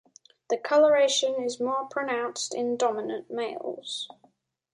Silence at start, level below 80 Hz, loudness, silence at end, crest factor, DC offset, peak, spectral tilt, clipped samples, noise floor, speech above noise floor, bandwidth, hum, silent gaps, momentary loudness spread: 0.5 s; -80 dBFS; -27 LUFS; 0.7 s; 16 dB; under 0.1%; -10 dBFS; -1.5 dB/octave; under 0.1%; -65 dBFS; 39 dB; 11 kHz; none; none; 13 LU